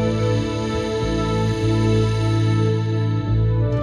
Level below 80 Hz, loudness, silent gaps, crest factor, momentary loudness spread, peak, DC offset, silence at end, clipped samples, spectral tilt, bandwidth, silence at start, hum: -32 dBFS; -20 LUFS; none; 10 dB; 4 LU; -8 dBFS; under 0.1%; 0 s; under 0.1%; -7.5 dB/octave; 9.8 kHz; 0 s; none